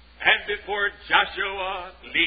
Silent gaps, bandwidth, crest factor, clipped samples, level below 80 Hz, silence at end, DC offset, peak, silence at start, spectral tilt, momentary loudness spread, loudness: none; 5 kHz; 22 dB; under 0.1%; -52 dBFS; 0 s; under 0.1%; -4 dBFS; 0.2 s; -6.5 dB/octave; 10 LU; -23 LUFS